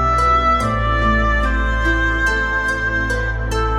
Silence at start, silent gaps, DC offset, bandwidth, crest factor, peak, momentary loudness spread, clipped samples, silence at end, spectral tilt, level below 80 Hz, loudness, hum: 0 s; none; under 0.1%; 11.5 kHz; 12 dB; -4 dBFS; 5 LU; under 0.1%; 0 s; -5.5 dB/octave; -22 dBFS; -17 LUFS; none